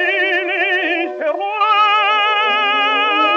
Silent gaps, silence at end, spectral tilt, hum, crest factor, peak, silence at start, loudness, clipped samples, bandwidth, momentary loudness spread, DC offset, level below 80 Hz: none; 0 s; -1 dB/octave; none; 12 dB; -4 dBFS; 0 s; -14 LUFS; under 0.1%; 7.4 kHz; 7 LU; under 0.1%; -82 dBFS